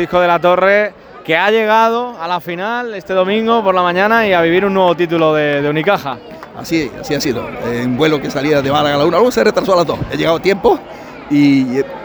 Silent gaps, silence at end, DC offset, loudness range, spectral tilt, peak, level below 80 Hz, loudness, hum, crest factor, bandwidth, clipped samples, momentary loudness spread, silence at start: none; 0 s; under 0.1%; 3 LU; -5.5 dB/octave; 0 dBFS; -44 dBFS; -14 LUFS; none; 14 dB; over 20 kHz; under 0.1%; 9 LU; 0 s